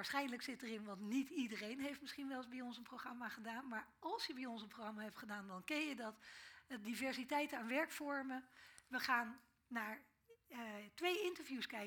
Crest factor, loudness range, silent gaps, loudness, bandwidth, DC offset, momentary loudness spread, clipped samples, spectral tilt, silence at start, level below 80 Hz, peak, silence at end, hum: 22 dB; 5 LU; none; -46 LUFS; 19 kHz; under 0.1%; 11 LU; under 0.1%; -3.5 dB/octave; 0 s; -86 dBFS; -24 dBFS; 0 s; none